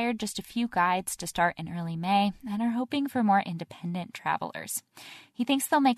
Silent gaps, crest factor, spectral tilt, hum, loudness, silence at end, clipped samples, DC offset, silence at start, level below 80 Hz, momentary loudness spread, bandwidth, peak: none; 18 dB; -4.5 dB/octave; none; -29 LUFS; 0 s; under 0.1%; under 0.1%; 0 s; -62 dBFS; 10 LU; 13.5 kHz; -10 dBFS